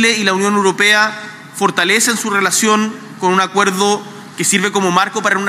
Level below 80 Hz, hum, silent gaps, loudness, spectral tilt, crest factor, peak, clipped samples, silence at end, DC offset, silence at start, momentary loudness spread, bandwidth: -68 dBFS; none; none; -13 LUFS; -2.5 dB/octave; 14 dB; 0 dBFS; under 0.1%; 0 s; under 0.1%; 0 s; 9 LU; 16 kHz